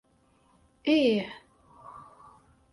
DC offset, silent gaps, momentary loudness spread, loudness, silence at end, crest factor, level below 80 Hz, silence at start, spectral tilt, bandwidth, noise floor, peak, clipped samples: under 0.1%; none; 25 LU; -26 LUFS; 0.7 s; 20 dB; -68 dBFS; 0.85 s; -6 dB/octave; 11.5 kHz; -65 dBFS; -12 dBFS; under 0.1%